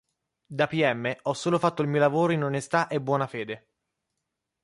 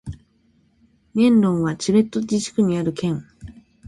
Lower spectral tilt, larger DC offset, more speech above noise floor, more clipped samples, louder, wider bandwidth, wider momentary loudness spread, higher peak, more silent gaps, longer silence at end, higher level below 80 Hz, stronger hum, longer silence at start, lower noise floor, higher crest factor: about the same, -6 dB/octave vs -6.5 dB/octave; neither; first, 57 dB vs 42 dB; neither; second, -26 LUFS vs -20 LUFS; about the same, 11.5 kHz vs 11.5 kHz; about the same, 11 LU vs 12 LU; about the same, -8 dBFS vs -6 dBFS; neither; first, 1.05 s vs 0 s; second, -70 dBFS vs -50 dBFS; neither; first, 0.5 s vs 0.05 s; first, -83 dBFS vs -60 dBFS; about the same, 18 dB vs 16 dB